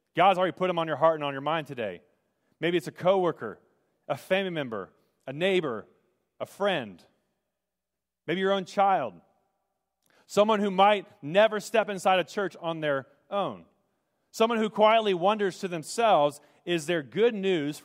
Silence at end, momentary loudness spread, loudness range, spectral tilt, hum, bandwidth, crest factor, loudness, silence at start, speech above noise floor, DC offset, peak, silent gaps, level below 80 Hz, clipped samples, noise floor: 0.05 s; 16 LU; 6 LU; -5 dB/octave; none; 16 kHz; 20 dB; -27 LUFS; 0.15 s; 62 dB; under 0.1%; -8 dBFS; none; -80 dBFS; under 0.1%; -88 dBFS